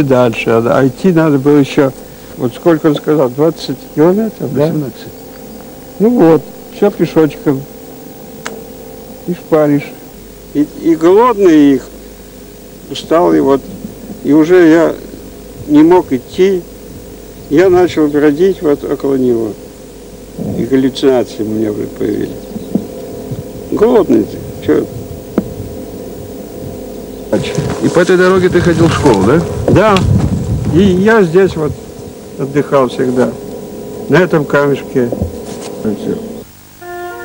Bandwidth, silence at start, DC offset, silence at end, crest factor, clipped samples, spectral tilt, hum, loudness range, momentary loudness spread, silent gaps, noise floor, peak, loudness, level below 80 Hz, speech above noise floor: 16.5 kHz; 0 s; under 0.1%; 0 s; 12 dB; under 0.1%; -7 dB/octave; none; 6 LU; 22 LU; none; -32 dBFS; 0 dBFS; -11 LUFS; -36 dBFS; 22 dB